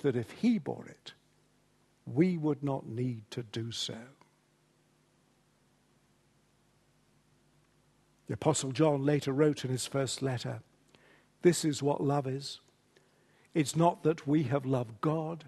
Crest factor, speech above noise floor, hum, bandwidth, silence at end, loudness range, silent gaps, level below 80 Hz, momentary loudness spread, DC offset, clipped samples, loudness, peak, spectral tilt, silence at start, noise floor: 22 dB; 39 dB; none; 12.5 kHz; 0 s; 10 LU; none; -72 dBFS; 14 LU; under 0.1%; under 0.1%; -32 LUFS; -12 dBFS; -6 dB/octave; 0.05 s; -70 dBFS